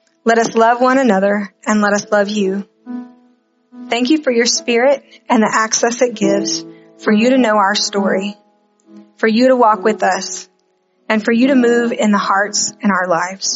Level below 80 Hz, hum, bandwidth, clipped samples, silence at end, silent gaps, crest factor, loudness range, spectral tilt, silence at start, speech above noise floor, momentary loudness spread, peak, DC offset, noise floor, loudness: -66 dBFS; none; 8 kHz; under 0.1%; 0 s; none; 14 dB; 2 LU; -3 dB/octave; 0.25 s; 47 dB; 9 LU; 0 dBFS; under 0.1%; -60 dBFS; -14 LUFS